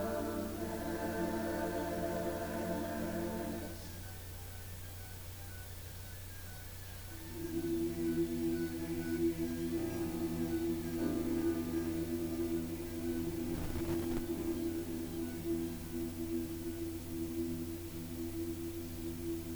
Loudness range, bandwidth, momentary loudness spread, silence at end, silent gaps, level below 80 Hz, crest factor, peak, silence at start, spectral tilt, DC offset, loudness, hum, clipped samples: 7 LU; over 20 kHz; 11 LU; 0 s; none; -54 dBFS; 16 dB; -22 dBFS; 0 s; -6 dB/octave; under 0.1%; -39 LUFS; none; under 0.1%